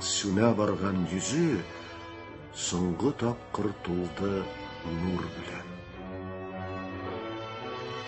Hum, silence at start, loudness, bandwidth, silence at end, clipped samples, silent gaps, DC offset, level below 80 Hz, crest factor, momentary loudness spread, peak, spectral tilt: none; 0 s; -31 LUFS; 8.6 kHz; 0 s; under 0.1%; none; under 0.1%; -52 dBFS; 22 dB; 15 LU; -10 dBFS; -5 dB/octave